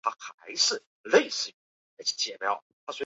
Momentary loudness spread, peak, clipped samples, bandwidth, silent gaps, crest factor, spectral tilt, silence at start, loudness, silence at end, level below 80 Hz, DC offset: 12 LU; -8 dBFS; under 0.1%; 8 kHz; 0.34-0.38 s, 0.87-1.04 s, 1.54-1.97 s, 2.62-2.87 s; 22 dB; -0.5 dB/octave; 0.05 s; -28 LUFS; 0 s; -80 dBFS; under 0.1%